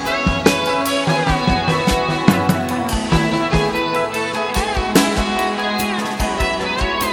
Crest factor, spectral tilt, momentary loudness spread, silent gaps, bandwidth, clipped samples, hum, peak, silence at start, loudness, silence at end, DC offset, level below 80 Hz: 18 dB; -4.5 dB/octave; 4 LU; none; 19.5 kHz; under 0.1%; none; 0 dBFS; 0 s; -18 LUFS; 0 s; under 0.1%; -28 dBFS